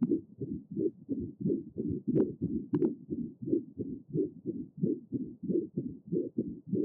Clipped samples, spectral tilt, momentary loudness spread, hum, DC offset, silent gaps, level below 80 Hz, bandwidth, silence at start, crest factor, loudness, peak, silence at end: under 0.1%; -13.5 dB/octave; 8 LU; none; under 0.1%; none; -64 dBFS; 2.9 kHz; 0 s; 16 dB; -35 LUFS; -18 dBFS; 0 s